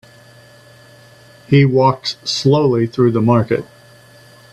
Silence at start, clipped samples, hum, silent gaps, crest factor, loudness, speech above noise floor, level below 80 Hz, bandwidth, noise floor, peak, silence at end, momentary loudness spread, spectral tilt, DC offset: 1.5 s; under 0.1%; none; none; 16 dB; -15 LUFS; 30 dB; -52 dBFS; 10.5 kHz; -44 dBFS; 0 dBFS; 0.9 s; 8 LU; -6.5 dB/octave; under 0.1%